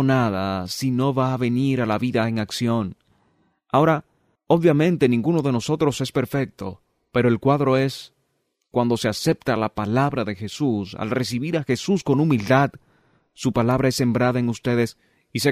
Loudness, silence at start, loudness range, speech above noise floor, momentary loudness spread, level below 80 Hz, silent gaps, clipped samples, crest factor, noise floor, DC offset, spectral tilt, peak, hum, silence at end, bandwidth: -22 LUFS; 0 s; 2 LU; 52 dB; 8 LU; -54 dBFS; none; under 0.1%; 16 dB; -72 dBFS; under 0.1%; -6.5 dB/octave; -6 dBFS; none; 0 s; 15.5 kHz